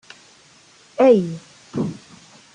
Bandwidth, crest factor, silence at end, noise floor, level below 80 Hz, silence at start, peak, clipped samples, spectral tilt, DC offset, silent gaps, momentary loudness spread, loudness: 10 kHz; 20 dB; 0.6 s; -51 dBFS; -64 dBFS; 1 s; -2 dBFS; under 0.1%; -7 dB/octave; under 0.1%; none; 22 LU; -19 LUFS